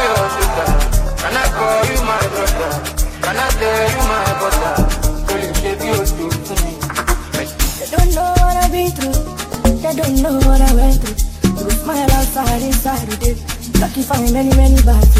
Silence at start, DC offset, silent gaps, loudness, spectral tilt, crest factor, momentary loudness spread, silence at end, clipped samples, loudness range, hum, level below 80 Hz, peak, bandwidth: 0 s; under 0.1%; none; -16 LUFS; -4.5 dB/octave; 14 dB; 7 LU; 0 s; under 0.1%; 2 LU; none; -16 dBFS; 0 dBFS; 16 kHz